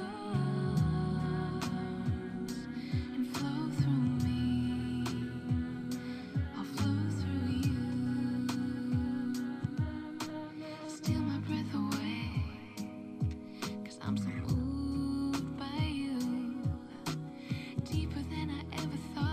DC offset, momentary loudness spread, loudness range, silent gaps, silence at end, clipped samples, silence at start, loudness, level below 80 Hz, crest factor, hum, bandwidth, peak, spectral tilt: under 0.1%; 8 LU; 3 LU; none; 0 s; under 0.1%; 0 s; -36 LUFS; -50 dBFS; 16 dB; none; 15.5 kHz; -20 dBFS; -6.5 dB/octave